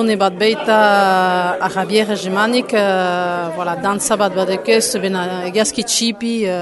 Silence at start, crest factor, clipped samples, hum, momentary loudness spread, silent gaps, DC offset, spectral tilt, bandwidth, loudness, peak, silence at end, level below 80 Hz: 0 s; 14 dB; under 0.1%; none; 7 LU; none; under 0.1%; -3.5 dB/octave; 12 kHz; -16 LUFS; 0 dBFS; 0 s; -58 dBFS